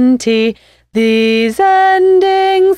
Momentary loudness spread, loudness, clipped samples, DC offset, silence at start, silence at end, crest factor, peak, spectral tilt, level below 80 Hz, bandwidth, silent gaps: 6 LU; -11 LUFS; under 0.1%; under 0.1%; 0 s; 0 s; 8 dB; -2 dBFS; -4.5 dB/octave; -50 dBFS; 14 kHz; none